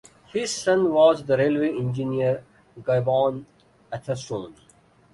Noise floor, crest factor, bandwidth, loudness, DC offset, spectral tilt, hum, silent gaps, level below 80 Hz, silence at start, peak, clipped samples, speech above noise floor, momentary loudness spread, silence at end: -57 dBFS; 18 dB; 11.5 kHz; -23 LUFS; under 0.1%; -5.5 dB/octave; none; none; -60 dBFS; 0.35 s; -6 dBFS; under 0.1%; 34 dB; 15 LU; 0.6 s